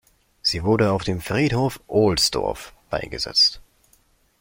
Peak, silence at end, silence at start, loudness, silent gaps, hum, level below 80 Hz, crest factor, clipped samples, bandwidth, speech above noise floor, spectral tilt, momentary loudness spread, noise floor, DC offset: -6 dBFS; 0.8 s; 0.45 s; -21 LUFS; none; none; -44 dBFS; 16 dB; under 0.1%; 16.5 kHz; 39 dB; -4.5 dB/octave; 12 LU; -61 dBFS; under 0.1%